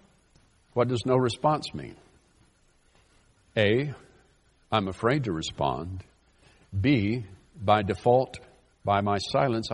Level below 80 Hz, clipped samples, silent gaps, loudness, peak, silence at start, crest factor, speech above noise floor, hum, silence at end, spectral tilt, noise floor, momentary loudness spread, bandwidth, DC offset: -58 dBFS; under 0.1%; none; -27 LUFS; -6 dBFS; 0.75 s; 22 dB; 38 dB; none; 0 s; -6.5 dB/octave; -64 dBFS; 14 LU; 11 kHz; under 0.1%